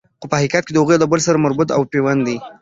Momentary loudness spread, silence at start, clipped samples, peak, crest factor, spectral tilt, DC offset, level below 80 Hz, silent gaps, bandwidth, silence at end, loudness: 5 LU; 0.2 s; under 0.1%; -2 dBFS; 14 dB; -5.5 dB/octave; under 0.1%; -54 dBFS; none; 8 kHz; 0.1 s; -16 LUFS